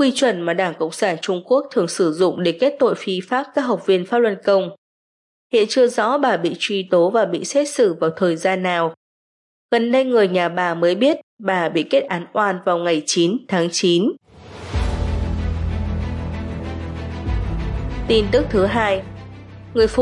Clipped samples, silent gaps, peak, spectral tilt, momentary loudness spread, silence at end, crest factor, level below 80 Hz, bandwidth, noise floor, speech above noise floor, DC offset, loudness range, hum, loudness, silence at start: under 0.1%; 4.78-5.50 s, 8.97-9.69 s, 11.23-11.37 s; -4 dBFS; -5 dB/octave; 10 LU; 0 s; 16 dB; -34 dBFS; 11.5 kHz; under -90 dBFS; over 72 dB; under 0.1%; 4 LU; none; -19 LUFS; 0 s